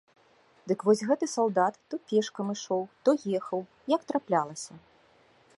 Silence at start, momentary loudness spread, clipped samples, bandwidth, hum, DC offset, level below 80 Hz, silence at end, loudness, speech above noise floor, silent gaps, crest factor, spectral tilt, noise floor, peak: 0.65 s; 11 LU; under 0.1%; 11.5 kHz; none; under 0.1%; -80 dBFS; 0.8 s; -29 LUFS; 34 dB; none; 20 dB; -5 dB/octave; -62 dBFS; -10 dBFS